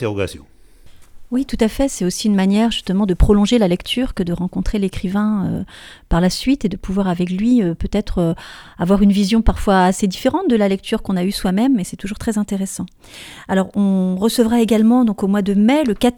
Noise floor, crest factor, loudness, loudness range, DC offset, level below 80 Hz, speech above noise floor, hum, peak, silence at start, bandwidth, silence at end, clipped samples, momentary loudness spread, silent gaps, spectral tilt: -41 dBFS; 16 dB; -17 LUFS; 3 LU; under 0.1%; -30 dBFS; 25 dB; none; 0 dBFS; 0 s; 17.5 kHz; 0.05 s; under 0.1%; 10 LU; none; -6 dB/octave